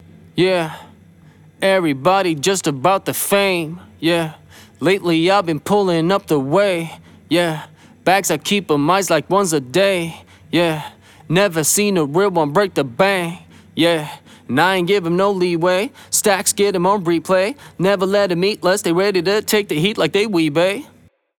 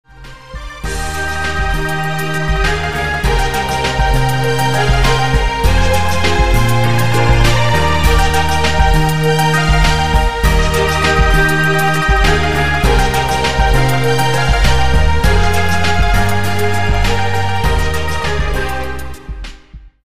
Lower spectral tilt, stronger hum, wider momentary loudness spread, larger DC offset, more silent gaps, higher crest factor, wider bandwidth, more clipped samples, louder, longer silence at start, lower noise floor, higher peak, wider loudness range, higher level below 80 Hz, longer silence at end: about the same, -4 dB/octave vs -5 dB/octave; neither; about the same, 7 LU vs 6 LU; second, under 0.1% vs 7%; neither; about the same, 16 dB vs 12 dB; first, 20 kHz vs 16 kHz; neither; second, -17 LUFS vs -14 LUFS; first, 0.35 s vs 0.05 s; first, -46 dBFS vs -36 dBFS; about the same, -2 dBFS vs -2 dBFS; second, 1 LU vs 4 LU; second, -60 dBFS vs -18 dBFS; first, 0.55 s vs 0.05 s